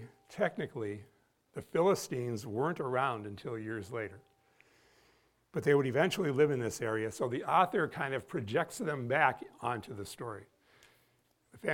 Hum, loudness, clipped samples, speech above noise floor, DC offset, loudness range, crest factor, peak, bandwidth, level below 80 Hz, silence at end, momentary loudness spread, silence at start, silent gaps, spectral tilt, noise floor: none; -34 LUFS; under 0.1%; 40 dB; under 0.1%; 5 LU; 22 dB; -12 dBFS; 17 kHz; -72 dBFS; 0 s; 13 LU; 0 s; none; -5.5 dB/octave; -73 dBFS